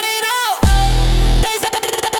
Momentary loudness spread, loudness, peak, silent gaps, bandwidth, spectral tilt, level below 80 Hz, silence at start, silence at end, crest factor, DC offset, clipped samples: 3 LU; -16 LUFS; -2 dBFS; none; 19 kHz; -3.5 dB/octave; -16 dBFS; 0 s; 0 s; 12 dB; under 0.1%; under 0.1%